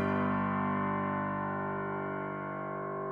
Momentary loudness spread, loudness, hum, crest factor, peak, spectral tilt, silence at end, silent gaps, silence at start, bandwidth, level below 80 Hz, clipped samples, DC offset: 7 LU; -34 LUFS; 50 Hz at -80 dBFS; 14 dB; -20 dBFS; -10 dB/octave; 0 s; none; 0 s; 5 kHz; -66 dBFS; under 0.1%; under 0.1%